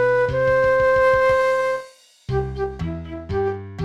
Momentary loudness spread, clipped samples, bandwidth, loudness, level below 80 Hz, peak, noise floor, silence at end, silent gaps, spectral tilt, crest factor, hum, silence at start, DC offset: 13 LU; under 0.1%; 11 kHz; -20 LUFS; -38 dBFS; -8 dBFS; -42 dBFS; 0 s; none; -6.5 dB/octave; 12 dB; none; 0 s; 0.2%